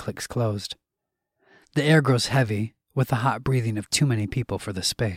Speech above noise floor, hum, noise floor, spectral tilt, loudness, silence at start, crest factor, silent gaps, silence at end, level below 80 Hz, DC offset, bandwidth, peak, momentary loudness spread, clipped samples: 61 dB; none; -84 dBFS; -5 dB/octave; -24 LUFS; 0 s; 18 dB; none; 0 s; -52 dBFS; under 0.1%; 16 kHz; -6 dBFS; 11 LU; under 0.1%